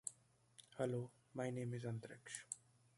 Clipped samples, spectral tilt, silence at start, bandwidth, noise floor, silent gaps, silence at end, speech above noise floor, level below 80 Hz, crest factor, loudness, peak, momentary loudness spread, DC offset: under 0.1%; -5.5 dB/octave; 0.05 s; 11.5 kHz; -71 dBFS; none; 0.4 s; 25 dB; -82 dBFS; 24 dB; -48 LUFS; -24 dBFS; 13 LU; under 0.1%